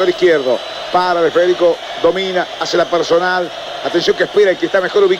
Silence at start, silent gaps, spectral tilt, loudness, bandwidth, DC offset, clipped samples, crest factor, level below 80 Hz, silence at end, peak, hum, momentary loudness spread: 0 s; none; -4 dB/octave; -14 LUFS; 11.5 kHz; under 0.1%; under 0.1%; 10 dB; -52 dBFS; 0 s; -4 dBFS; none; 6 LU